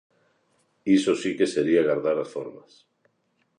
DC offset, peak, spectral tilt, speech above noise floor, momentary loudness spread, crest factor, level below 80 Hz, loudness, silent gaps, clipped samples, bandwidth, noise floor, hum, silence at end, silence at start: under 0.1%; -8 dBFS; -5.5 dB/octave; 48 dB; 14 LU; 18 dB; -68 dBFS; -24 LUFS; none; under 0.1%; 10.5 kHz; -71 dBFS; none; 1 s; 0.85 s